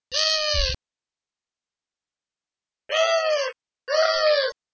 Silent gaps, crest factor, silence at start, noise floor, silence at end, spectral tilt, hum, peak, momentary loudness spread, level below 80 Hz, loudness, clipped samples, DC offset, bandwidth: none; 18 dB; 0.1 s; under -90 dBFS; 0.2 s; -0.5 dB/octave; none; -8 dBFS; 9 LU; -40 dBFS; -22 LUFS; under 0.1%; under 0.1%; 8 kHz